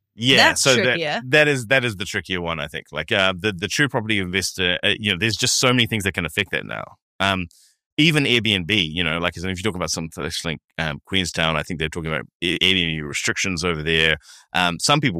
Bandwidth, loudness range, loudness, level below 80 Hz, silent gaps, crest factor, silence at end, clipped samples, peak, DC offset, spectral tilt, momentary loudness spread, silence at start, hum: 15.5 kHz; 3 LU; -20 LUFS; -46 dBFS; 7.02-7.19 s, 7.86-7.97 s, 10.65-10.69 s, 12.35-12.40 s; 20 dB; 0 s; under 0.1%; 0 dBFS; under 0.1%; -3 dB/octave; 10 LU; 0.15 s; none